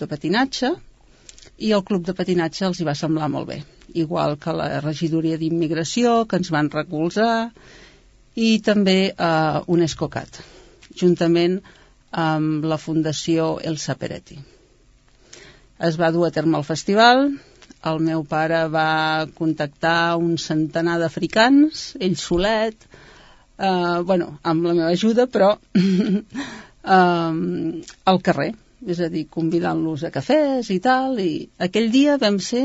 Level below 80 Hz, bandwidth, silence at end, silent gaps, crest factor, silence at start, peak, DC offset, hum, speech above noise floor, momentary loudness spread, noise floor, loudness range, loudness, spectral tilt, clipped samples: -52 dBFS; 8 kHz; 0 s; none; 20 dB; 0 s; 0 dBFS; under 0.1%; none; 34 dB; 10 LU; -54 dBFS; 4 LU; -20 LUFS; -5.5 dB/octave; under 0.1%